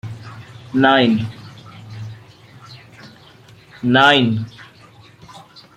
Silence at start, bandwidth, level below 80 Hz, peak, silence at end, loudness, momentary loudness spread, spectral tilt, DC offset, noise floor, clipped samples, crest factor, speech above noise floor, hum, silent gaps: 0.05 s; 10.5 kHz; -58 dBFS; 0 dBFS; 0.4 s; -15 LUFS; 26 LU; -6 dB/octave; under 0.1%; -45 dBFS; under 0.1%; 20 dB; 31 dB; none; none